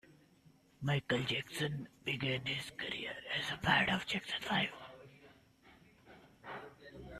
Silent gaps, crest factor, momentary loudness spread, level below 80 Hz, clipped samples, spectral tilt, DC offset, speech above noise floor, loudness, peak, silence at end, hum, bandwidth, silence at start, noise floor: none; 24 dB; 21 LU; -66 dBFS; under 0.1%; -4.5 dB/octave; under 0.1%; 29 dB; -36 LUFS; -16 dBFS; 0 s; none; 14 kHz; 0.1 s; -66 dBFS